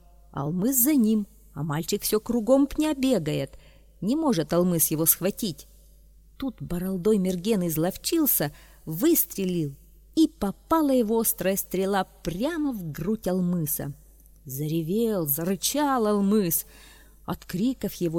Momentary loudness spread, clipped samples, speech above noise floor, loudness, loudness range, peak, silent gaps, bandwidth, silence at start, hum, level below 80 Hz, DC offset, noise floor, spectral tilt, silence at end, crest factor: 12 LU; under 0.1%; 28 dB; -25 LUFS; 3 LU; -6 dBFS; none; 19 kHz; 0.35 s; none; -50 dBFS; under 0.1%; -53 dBFS; -5 dB/octave; 0 s; 20 dB